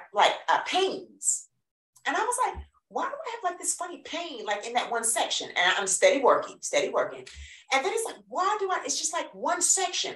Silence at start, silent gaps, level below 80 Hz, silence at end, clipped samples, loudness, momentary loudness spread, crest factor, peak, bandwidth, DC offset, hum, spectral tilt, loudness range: 0 s; 1.71-1.93 s; -58 dBFS; 0 s; under 0.1%; -27 LUFS; 11 LU; 20 dB; -6 dBFS; 14 kHz; under 0.1%; none; -0.5 dB/octave; 5 LU